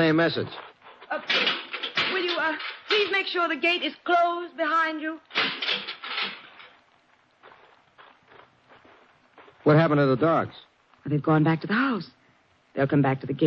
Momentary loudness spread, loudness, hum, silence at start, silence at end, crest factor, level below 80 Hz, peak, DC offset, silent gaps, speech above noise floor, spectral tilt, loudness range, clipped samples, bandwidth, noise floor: 12 LU; -24 LUFS; none; 0 s; 0 s; 18 dB; -68 dBFS; -10 dBFS; under 0.1%; none; 39 dB; -7 dB/octave; 7 LU; under 0.1%; 7.2 kHz; -62 dBFS